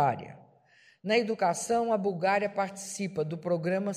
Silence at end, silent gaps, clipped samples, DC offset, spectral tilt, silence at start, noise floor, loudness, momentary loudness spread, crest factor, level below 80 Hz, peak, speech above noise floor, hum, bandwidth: 0 s; none; under 0.1%; under 0.1%; -5 dB/octave; 0 s; -62 dBFS; -29 LUFS; 8 LU; 18 dB; -74 dBFS; -12 dBFS; 33 dB; none; 15 kHz